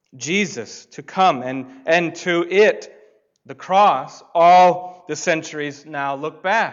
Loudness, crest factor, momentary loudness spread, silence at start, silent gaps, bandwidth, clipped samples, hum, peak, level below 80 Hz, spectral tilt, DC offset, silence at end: -18 LUFS; 14 dB; 16 LU; 0.15 s; none; 7.6 kHz; under 0.1%; none; -6 dBFS; -70 dBFS; -4 dB/octave; under 0.1%; 0 s